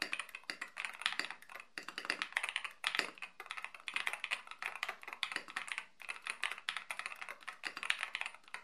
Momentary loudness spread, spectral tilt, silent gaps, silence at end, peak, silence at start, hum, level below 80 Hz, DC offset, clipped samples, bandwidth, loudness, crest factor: 9 LU; 1 dB/octave; none; 0 s; -10 dBFS; 0 s; none; -88 dBFS; under 0.1%; under 0.1%; 13 kHz; -41 LUFS; 32 dB